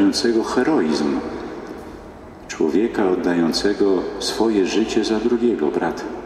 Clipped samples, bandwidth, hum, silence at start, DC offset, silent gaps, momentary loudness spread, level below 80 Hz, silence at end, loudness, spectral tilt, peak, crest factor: under 0.1%; 13.5 kHz; none; 0 s; under 0.1%; none; 15 LU; -48 dBFS; 0 s; -19 LUFS; -4.5 dB/octave; -6 dBFS; 14 dB